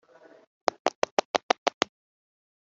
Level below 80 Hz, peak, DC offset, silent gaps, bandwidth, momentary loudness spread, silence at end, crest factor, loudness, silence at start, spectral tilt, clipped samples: -78 dBFS; -2 dBFS; under 0.1%; 0.95-1.02 s, 1.11-1.17 s, 1.25-1.34 s, 1.43-1.49 s, 1.58-1.66 s; 8 kHz; 6 LU; 1 s; 28 dB; -29 LUFS; 0.85 s; 0 dB/octave; under 0.1%